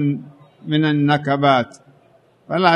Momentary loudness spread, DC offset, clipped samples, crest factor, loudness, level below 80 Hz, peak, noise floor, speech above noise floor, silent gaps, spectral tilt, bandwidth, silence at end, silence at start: 13 LU; under 0.1%; under 0.1%; 18 dB; -18 LUFS; -64 dBFS; -2 dBFS; -54 dBFS; 37 dB; none; -7.5 dB/octave; 9.4 kHz; 0 s; 0 s